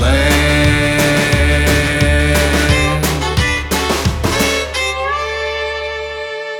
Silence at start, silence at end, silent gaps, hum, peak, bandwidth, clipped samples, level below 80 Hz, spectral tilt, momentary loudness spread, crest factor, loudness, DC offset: 0 s; 0 s; none; none; 0 dBFS; 20 kHz; under 0.1%; -20 dBFS; -4.5 dB/octave; 8 LU; 14 dB; -14 LUFS; under 0.1%